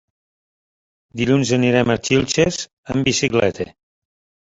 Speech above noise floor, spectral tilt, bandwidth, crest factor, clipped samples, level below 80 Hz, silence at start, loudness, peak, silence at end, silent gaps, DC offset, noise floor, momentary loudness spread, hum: over 72 dB; -4.5 dB/octave; 8 kHz; 18 dB; under 0.1%; -46 dBFS; 1.15 s; -18 LUFS; -2 dBFS; 0.8 s; 2.73-2.83 s; under 0.1%; under -90 dBFS; 12 LU; none